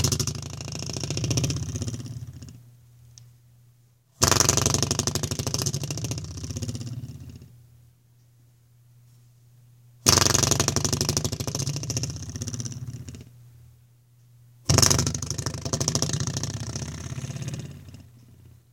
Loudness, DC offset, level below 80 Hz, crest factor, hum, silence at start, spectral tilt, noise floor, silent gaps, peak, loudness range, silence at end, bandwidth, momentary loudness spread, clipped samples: -25 LUFS; under 0.1%; -46 dBFS; 28 dB; none; 0 s; -3 dB/octave; -59 dBFS; none; 0 dBFS; 10 LU; 0.4 s; 17 kHz; 19 LU; under 0.1%